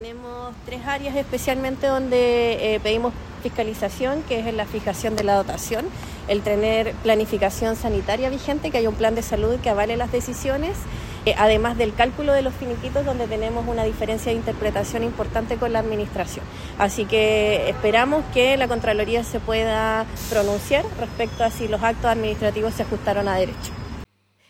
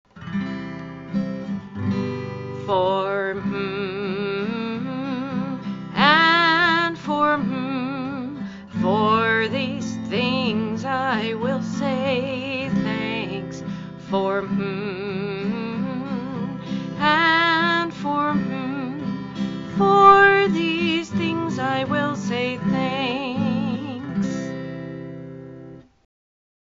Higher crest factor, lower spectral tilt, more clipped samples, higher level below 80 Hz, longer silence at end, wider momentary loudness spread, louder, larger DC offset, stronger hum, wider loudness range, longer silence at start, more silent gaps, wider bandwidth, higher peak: about the same, 18 dB vs 22 dB; first, -5 dB/octave vs -3.5 dB/octave; neither; first, -36 dBFS vs -56 dBFS; second, 0.45 s vs 0.95 s; second, 9 LU vs 14 LU; about the same, -22 LUFS vs -22 LUFS; neither; neither; second, 4 LU vs 8 LU; second, 0 s vs 0.15 s; neither; first, 17 kHz vs 7.6 kHz; second, -4 dBFS vs 0 dBFS